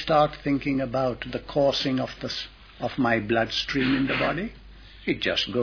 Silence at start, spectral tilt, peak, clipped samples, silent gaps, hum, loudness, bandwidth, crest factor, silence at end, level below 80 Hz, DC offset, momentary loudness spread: 0 s; -5.5 dB/octave; -8 dBFS; under 0.1%; none; none; -25 LUFS; 5.4 kHz; 18 dB; 0 s; -48 dBFS; under 0.1%; 10 LU